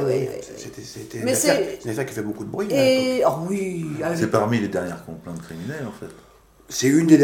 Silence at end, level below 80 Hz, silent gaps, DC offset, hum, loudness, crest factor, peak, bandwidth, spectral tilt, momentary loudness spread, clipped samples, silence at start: 0 s; -56 dBFS; none; under 0.1%; none; -22 LUFS; 20 dB; -2 dBFS; 17.5 kHz; -5 dB/octave; 17 LU; under 0.1%; 0 s